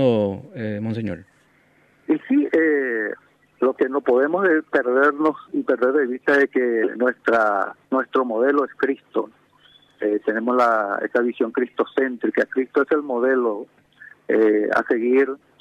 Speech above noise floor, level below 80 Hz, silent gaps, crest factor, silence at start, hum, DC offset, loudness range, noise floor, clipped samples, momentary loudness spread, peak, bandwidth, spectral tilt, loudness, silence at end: 38 dB; -68 dBFS; none; 16 dB; 0 s; none; under 0.1%; 3 LU; -58 dBFS; under 0.1%; 9 LU; -6 dBFS; 7.8 kHz; -7.5 dB/octave; -21 LUFS; 0.25 s